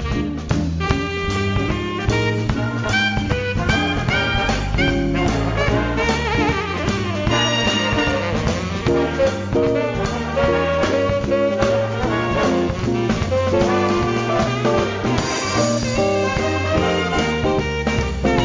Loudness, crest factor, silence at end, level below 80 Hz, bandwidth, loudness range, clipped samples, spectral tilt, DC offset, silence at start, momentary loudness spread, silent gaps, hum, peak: -19 LUFS; 16 dB; 0 s; -30 dBFS; 7.6 kHz; 1 LU; under 0.1%; -5.5 dB/octave; under 0.1%; 0 s; 4 LU; none; none; -4 dBFS